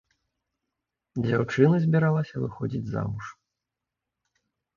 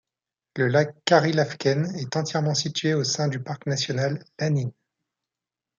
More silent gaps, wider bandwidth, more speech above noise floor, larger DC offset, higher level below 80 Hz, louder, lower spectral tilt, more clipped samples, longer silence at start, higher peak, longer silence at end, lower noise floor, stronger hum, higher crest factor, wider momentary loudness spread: neither; about the same, 7.2 kHz vs 7.6 kHz; about the same, 62 dB vs 65 dB; neither; first, -58 dBFS vs -68 dBFS; about the same, -25 LUFS vs -24 LUFS; first, -8.5 dB/octave vs -5 dB/octave; neither; first, 1.15 s vs 0.55 s; about the same, -6 dBFS vs -4 dBFS; first, 1.45 s vs 1.1 s; about the same, -87 dBFS vs -89 dBFS; neither; about the same, 22 dB vs 20 dB; first, 15 LU vs 8 LU